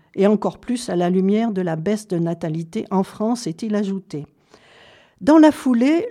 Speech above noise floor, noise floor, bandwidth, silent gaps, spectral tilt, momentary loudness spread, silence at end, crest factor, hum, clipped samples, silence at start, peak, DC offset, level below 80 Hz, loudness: 31 dB; -50 dBFS; 13 kHz; none; -7 dB/octave; 12 LU; 0 s; 16 dB; none; under 0.1%; 0.15 s; -2 dBFS; under 0.1%; -60 dBFS; -19 LUFS